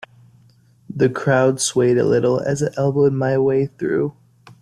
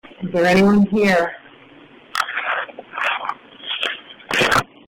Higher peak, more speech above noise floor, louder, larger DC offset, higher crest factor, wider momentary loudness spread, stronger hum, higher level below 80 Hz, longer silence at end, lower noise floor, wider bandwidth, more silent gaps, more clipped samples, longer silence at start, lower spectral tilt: first, -2 dBFS vs -6 dBFS; first, 35 dB vs 30 dB; about the same, -18 LUFS vs -19 LUFS; neither; about the same, 16 dB vs 14 dB; second, 5 LU vs 15 LU; neither; about the same, -54 dBFS vs -50 dBFS; first, 0.5 s vs 0.25 s; first, -53 dBFS vs -45 dBFS; second, 13 kHz vs 16.5 kHz; neither; neither; first, 0.9 s vs 0.2 s; about the same, -5.5 dB/octave vs -5 dB/octave